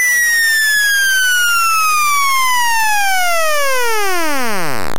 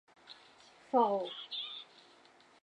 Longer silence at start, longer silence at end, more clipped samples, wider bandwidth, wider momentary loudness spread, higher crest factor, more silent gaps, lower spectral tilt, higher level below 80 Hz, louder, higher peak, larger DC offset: second, 0 s vs 0.3 s; second, 0 s vs 0.8 s; neither; first, 17 kHz vs 10 kHz; second, 6 LU vs 25 LU; second, 8 dB vs 22 dB; neither; second, 0 dB/octave vs -5 dB/octave; first, -50 dBFS vs -90 dBFS; first, -12 LUFS vs -34 LUFS; first, -8 dBFS vs -16 dBFS; first, 10% vs under 0.1%